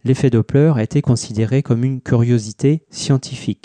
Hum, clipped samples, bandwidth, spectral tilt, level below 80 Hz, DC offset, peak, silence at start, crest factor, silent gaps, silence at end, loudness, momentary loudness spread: none; under 0.1%; 9.8 kHz; -7 dB/octave; -48 dBFS; under 0.1%; -4 dBFS; 0.05 s; 12 dB; none; 0.1 s; -17 LUFS; 4 LU